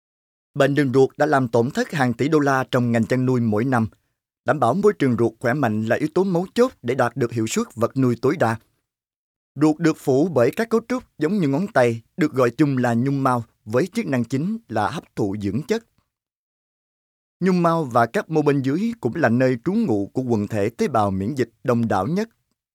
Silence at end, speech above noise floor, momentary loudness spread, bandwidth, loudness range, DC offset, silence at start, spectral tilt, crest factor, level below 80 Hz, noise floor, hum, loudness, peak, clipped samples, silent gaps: 0.5 s; 56 dB; 6 LU; 16 kHz; 4 LU; under 0.1%; 0.55 s; -7 dB/octave; 16 dB; -62 dBFS; -76 dBFS; none; -21 LUFS; -4 dBFS; under 0.1%; 9.16-9.55 s, 16.36-17.40 s